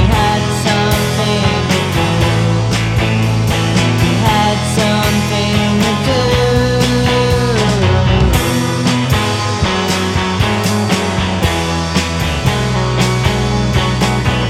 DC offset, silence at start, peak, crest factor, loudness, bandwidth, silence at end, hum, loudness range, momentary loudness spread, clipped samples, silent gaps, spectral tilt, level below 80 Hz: 0.1%; 0 s; 0 dBFS; 12 dB; -13 LUFS; 16 kHz; 0 s; none; 2 LU; 3 LU; under 0.1%; none; -5 dB/octave; -26 dBFS